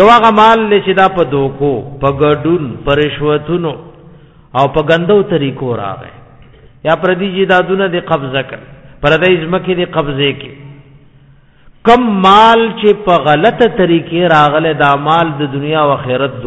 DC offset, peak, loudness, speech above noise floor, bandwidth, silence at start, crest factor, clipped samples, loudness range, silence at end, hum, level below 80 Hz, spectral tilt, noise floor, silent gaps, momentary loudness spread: under 0.1%; 0 dBFS; -11 LUFS; 33 dB; 8.4 kHz; 0 s; 12 dB; 0.5%; 6 LU; 0 s; none; -38 dBFS; -7 dB/octave; -43 dBFS; none; 11 LU